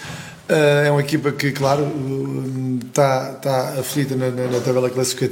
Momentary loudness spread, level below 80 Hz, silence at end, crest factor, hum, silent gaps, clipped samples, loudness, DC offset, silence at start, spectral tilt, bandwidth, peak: 8 LU; -60 dBFS; 0 s; 18 dB; none; none; under 0.1%; -19 LUFS; under 0.1%; 0 s; -5.5 dB/octave; 17 kHz; -2 dBFS